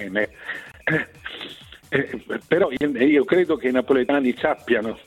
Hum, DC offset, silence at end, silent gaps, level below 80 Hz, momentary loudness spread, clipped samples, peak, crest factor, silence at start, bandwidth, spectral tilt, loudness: none; under 0.1%; 0.05 s; none; -56 dBFS; 15 LU; under 0.1%; -6 dBFS; 16 dB; 0 s; 13.5 kHz; -6.5 dB/octave; -21 LUFS